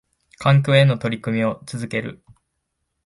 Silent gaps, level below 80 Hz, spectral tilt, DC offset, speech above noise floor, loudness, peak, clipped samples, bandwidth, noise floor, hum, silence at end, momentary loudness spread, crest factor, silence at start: none; -56 dBFS; -7 dB/octave; under 0.1%; 57 dB; -20 LUFS; -2 dBFS; under 0.1%; 11.5 kHz; -75 dBFS; none; 0.95 s; 13 LU; 18 dB; 0.4 s